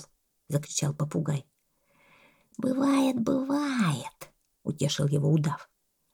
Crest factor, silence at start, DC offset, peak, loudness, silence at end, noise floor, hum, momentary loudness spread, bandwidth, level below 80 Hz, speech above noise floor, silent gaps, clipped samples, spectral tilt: 16 dB; 0 s; under 0.1%; -12 dBFS; -28 LUFS; 0.5 s; -69 dBFS; none; 13 LU; 17.5 kHz; -68 dBFS; 42 dB; none; under 0.1%; -5.5 dB/octave